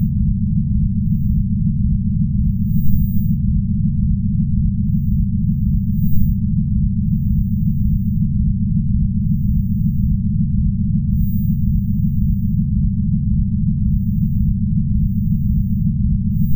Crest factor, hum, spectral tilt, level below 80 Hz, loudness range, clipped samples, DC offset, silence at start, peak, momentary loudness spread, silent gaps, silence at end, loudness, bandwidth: 16 dB; none; -18 dB/octave; -22 dBFS; 0 LU; under 0.1%; under 0.1%; 0 s; 0 dBFS; 1 LU; none; 0 s; -18 LUFS; 16 kHz